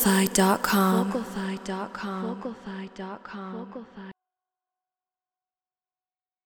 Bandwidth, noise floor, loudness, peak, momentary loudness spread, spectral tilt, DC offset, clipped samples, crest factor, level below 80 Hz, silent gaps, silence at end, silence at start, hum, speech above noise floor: over 20 kHz; under -90 dBFS; -26 LUFS; -6 dBFS; 19 LU; -4.5 dB/octave; under 0.1%; under 0.1%; 24 dB; -58 dBFS; none; 2.35 s; 0 s; none; over 63 dB